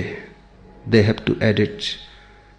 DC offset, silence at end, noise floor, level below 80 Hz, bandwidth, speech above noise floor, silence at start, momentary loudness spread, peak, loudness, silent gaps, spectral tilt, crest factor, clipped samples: under 0.1%; 0.5 s; -46 dBFS; -48 dBFS; 9.6 kHz; 27 dB; 0 s; 18 LU; -2 dBFS; -20 LUFS; none; -6.5 dB/octave; 20 dB; under 0.1%